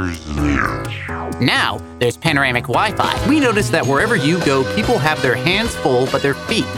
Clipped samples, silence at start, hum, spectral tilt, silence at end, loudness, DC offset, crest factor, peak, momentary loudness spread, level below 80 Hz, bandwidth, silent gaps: under 0.1%; 0 s; none; -5 dB/octave; 0 s; -16 LUFS; under 0.1%; 16 dB; 0 dBFS; 6 LU; -34 dBFS; 17 kHz; none